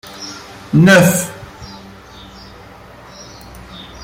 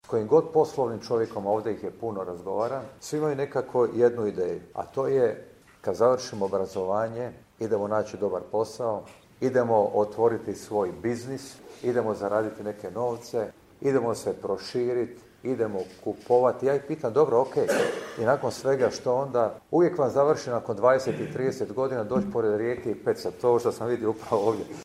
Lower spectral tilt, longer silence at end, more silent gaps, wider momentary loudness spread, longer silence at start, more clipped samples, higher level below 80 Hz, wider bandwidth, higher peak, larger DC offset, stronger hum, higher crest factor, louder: about the same, -5 dB/octave vs -6 dB/octave; about the same, 0 s vs 0 s; neither; first, 28 LU vs 10 LU; about the same, 0.15 s vs 0.1 s; neither; first, -46 dBFS vs -64 dBFS; first, 16.5 kHz vs 14 kHz; first, 0 dBFS vs -6 dBFS; neither; neither; about the same, 18 dB vs 20 dB; first, -11 LUFS vs -27 LUFS